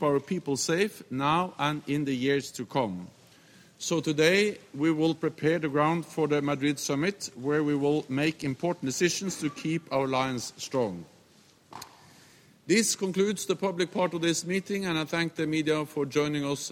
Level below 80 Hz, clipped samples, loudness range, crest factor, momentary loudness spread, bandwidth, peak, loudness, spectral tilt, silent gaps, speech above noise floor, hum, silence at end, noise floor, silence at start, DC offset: -68 dBFS; under 0.1%; 4 LU; 20 dB; 7 LU; 16.5 kHz; -10 dBFS; -28 LUFS; -4.5 dB/octave; none; 32 dB; none; 0 s; -59 dBFS; 0 s; under 0.1%